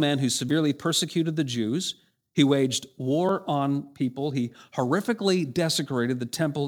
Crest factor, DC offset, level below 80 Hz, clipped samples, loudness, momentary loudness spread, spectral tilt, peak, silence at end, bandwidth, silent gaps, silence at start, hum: 18 dB; under 0.1%; -70 dBFS; under 0.1%; -26 LUFS; 7 LU; -5 dB/octave; -8 dBFS; 0 s; 19 kHz; none; 0 s; none